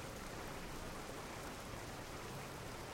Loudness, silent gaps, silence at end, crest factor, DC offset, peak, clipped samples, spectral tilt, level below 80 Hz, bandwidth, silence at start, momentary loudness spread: -48 LUFS; none; 0 s; 14 dB; under 0.1%; -34 dBFS; under 0.1%; -4 dB/octave; -56 dBFS; 16.5 kHz; 0 s; 1 LU